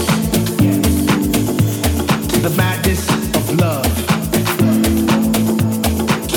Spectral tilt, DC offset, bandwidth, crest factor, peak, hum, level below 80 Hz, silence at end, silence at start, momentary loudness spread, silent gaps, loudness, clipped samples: -5 dB/octave; under 0.1%; 19 kHz; 14 dB; -2 dBFS; none; -28 dBFS; 0 s; 0 s; 3 LU; none; -15 LUFS; under 0.1%